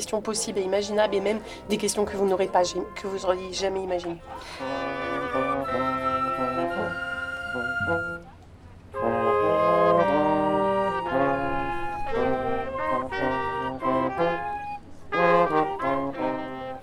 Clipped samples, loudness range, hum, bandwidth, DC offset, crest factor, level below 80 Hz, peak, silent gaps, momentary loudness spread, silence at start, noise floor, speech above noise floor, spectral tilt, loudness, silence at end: under 0.1%; 5 LU; none; 16 kHz; under 0.1%; 20 dB; -48 dBFS; -6 dBFS; none; 11 LU; 0 s; -47 dBFS; 20 dB; -4.5 dB/octave; -26 LUFS; 0 s